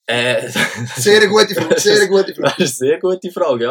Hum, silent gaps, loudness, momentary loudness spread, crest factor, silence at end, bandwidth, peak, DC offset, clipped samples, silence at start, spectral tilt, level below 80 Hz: none; none; -14 LUFS; 7 LU; 14 dB; 0 s; 18.5 kHz; 0 dBFS; under 0.1%; under 0.1%; 0.1 s; -3 dB/octave; -62 dBFS